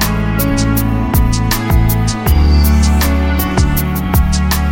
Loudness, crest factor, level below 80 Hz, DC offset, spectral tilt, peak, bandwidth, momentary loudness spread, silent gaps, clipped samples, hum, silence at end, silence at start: -13 LUFS; 12 dB; -14 dBFS; 0.6%; -5.5 dB/octave; 0 dBFS; 17 kHz; 4 LU; none; under 0.1%; none; 0 s; 0 s